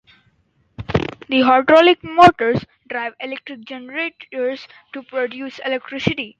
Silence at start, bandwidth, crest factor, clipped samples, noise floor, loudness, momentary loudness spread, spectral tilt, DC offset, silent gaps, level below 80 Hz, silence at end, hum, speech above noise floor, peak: 0.8 s; 9.2 kHz; 18 dB; under 0.1%; -62 dBFS; -17 LUFS; 20 LU; -6 dB/octave; under 0.1%; none; -48 dBFS; 0.1 s; none; 44 dB; 0 dBFS